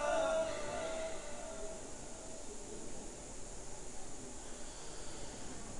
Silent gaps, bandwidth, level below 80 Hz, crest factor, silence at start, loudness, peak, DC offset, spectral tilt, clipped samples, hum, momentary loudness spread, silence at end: none; 11 kHz; -54 dBFS; 18 dB; 0 s; -44 LUFS; -24 dBFS; under 0.1%; -3 dB/octave; under 0.1%; none; 12 LU; 0 s